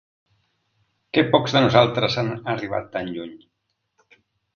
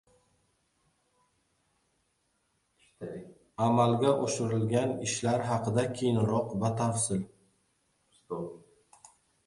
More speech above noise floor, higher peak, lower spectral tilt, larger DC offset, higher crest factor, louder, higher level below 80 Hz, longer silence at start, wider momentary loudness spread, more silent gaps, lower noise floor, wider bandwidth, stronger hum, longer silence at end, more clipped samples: first, 54 dB vs 47 dB; first, 0 dBFS vs -12 dBFS; about the same, -6 dB/octave vs -5.5 dB/octave; neither; about the same, 22 dB vs 20 dB; first, -21 LUFS vs -29 LUFS; first, -56 dBFS vs -64 dBFS; second, 1.15 s vs 3 s; second, 14 LU vs 17 LU; neither; about the same, -75 dBFS vs -75 dBFS; second, 7 kHz vs 11.5 kHz; neither; first, 1.2 s vs 0.9 s; neither